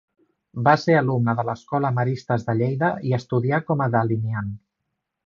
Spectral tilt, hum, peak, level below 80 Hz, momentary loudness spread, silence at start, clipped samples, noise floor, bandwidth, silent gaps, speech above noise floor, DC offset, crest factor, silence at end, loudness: -8 dB/octave; none; -2 dBFS; -58 dBFS; 8 LU; 0.55 s; under 0.1%; -79 dBFS; 7.2 kHz; none; 58 dB; under 0.1%; 20 dB; 0.7 s; -22 LUFS